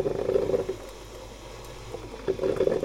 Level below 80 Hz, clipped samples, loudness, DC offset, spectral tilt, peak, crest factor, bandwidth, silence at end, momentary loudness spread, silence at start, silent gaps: -48 dBFS; under 0.1%; -29 LUFS; under 0.1%; -6 dB/octave; -8 dBFS; 20 dB; 16 kHz; 0 s; 17 LU; 0 s; none